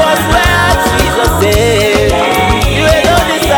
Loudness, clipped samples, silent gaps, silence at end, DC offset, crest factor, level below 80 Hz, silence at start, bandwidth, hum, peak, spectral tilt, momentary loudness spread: -9 LUFS; under 0.1%; none; 0 s; under 0.1%; 10 dB; -18 dBFS; 0 s; over 20 kHz; none; 0 dBFS; -4 dB/octave; 2 LU